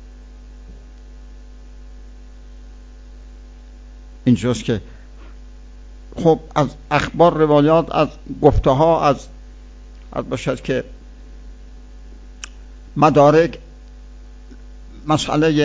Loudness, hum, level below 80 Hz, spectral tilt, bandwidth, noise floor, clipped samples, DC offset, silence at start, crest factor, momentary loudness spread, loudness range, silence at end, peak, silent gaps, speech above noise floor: -17 LUFS; none; -36 dBFS; -6.5 dB/octave; 8 kHz; -38 dBFS; under 0.1%; under 0.1%; 0 s; 20 dB; 22 LU; 11 LU; 0 s; 0 dBFS; none; 23 dB